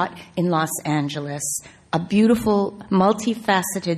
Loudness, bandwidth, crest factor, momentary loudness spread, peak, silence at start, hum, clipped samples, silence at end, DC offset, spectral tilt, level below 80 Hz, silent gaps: -21 LUFS; 14 kHz; 16 dB; 9 LU; -6 dBFS; 0 s; none; under 0.1%; 0 s; under 0.1%; -5 dB/octave; -52 dBFS; none